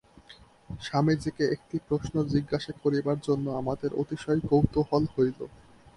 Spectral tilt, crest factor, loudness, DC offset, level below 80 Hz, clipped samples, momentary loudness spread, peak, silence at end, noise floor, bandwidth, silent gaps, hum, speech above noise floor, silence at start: -7.5 dB/octave; 22 dB; -28 LUFS; under 0.1%; -50 dBFS; under 0.1%; 8 LU; -8 dBFS; 0.4 s; -54 dBFS; 11.5 kHz; none; none; 27 dB; 0.3 s